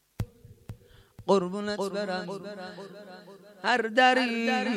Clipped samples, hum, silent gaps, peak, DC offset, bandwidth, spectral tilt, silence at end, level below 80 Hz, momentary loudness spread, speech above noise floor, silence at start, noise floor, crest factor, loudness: under 0.1%; none; none; -8 dBFS; under 0.1%; 15.5 kHz; -4.5 dB/octave; 0 s; -56 dBFS; 26 LU; 25 dB; 0.2 s; -53 dBFS; 20 dB; -27 LUFS